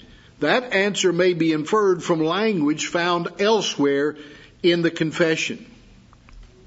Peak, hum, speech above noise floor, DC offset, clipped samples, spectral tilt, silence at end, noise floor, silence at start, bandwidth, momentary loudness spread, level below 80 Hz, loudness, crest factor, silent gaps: -4 dBFS; none; 29 dB; under 0.1%; under 0.1%; -4.5 dB/octave; 0.2 s; -49 dBFS; 0.4 s; 8 kHz; 5 LU; -56 dBFS; -21 LUFS; 18 dB; none